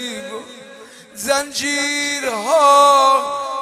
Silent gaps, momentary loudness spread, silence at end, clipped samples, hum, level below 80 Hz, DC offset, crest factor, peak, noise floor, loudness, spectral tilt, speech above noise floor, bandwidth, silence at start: none; 18 LU; 0 s; under 0.1%; none; -62 dBFS; under 0.1%; 16 dB; -2 dBFS; -40 dBFS; -15 LUFS; -0.5 dB/octave; 25 dB; 15.5 kHz; 0 s